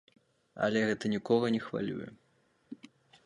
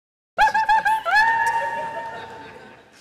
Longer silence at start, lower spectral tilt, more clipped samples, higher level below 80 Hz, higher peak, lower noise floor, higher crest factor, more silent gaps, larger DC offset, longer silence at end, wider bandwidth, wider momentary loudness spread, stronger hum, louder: first, 0.55 s vs 0.35 s; first, -6 dB/octave vs -1.5 dB/octave; neither; second, -72 dBFS vs -50 dBFS; second, -14 dBFS vs -10 dBFS; first, -71 dBFS vs -45 dBFS; first, 20 dB vs 12 dB; neither; neither; first, 0.5 s vs 0.3 s; second, 10.5 kHz vs 15 kHz; first, 22 LU vs 18 LU; neither; second, -32 LUFS vs -19 LUFS